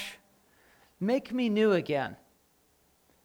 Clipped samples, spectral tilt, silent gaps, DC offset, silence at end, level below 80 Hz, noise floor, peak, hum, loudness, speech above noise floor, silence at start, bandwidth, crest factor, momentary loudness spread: under 0.1%; -6.5 dB/octave; none; under 0.1%; 1.1 s; -72 dBFS; -68 dBFS; -14 dBFS; none; -29 LUFS; 40 dB; 0 s; 19.5 kHz; 18 dB; 12 LU